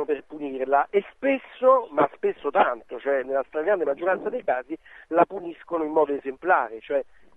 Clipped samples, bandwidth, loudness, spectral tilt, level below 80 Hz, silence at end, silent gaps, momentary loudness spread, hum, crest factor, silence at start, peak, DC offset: under 0.1%; 3.9 kHz; -25 LUFS; -7.5 dB/octave; -64 dBFS; 0.35 s; none; 9 LU; none; 20 dB; 0 s; -4 dBFS; 0.1%